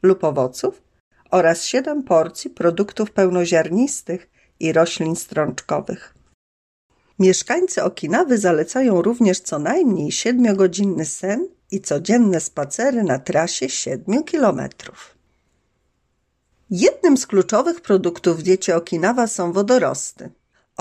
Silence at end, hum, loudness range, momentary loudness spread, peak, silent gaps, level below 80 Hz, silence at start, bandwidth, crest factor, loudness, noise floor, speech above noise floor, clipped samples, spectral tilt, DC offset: 0.5 s; none; 4 LU; 10 LU; -4 dBFS; 1.00-1.11 s, 6.34-6.90 s; -62 dBFS; 0.05 s; 13 kHz; 16 dB; -19 LUFS; -69 dBFS; 50 dB; under 0.1%; -5 dB/octave; under 0.1%